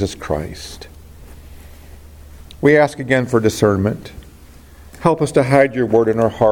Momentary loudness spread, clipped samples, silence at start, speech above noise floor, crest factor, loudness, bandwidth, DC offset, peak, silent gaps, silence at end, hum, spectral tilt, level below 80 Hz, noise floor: 17 LU; under 0.1%; 0 s; 26 dB; 18 dB; -16 LUFS; 17 kHz; under 0.1%; 0 dBFS; none; 0 s; none; -6.5 dB/octave; -42 dBFS; -41 dBFS